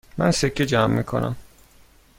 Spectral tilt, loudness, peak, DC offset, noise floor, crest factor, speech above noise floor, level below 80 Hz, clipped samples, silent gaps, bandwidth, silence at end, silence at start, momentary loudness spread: -5.5 dB/octave; -22 LUFS; -4 dBFS; under 0.1%; -53 dBFS; 20 dB; 32 dB; -44 dBFS; under 0.1%; none; 16.5 kHz; 0.75 s; 0.15 s; 8 LU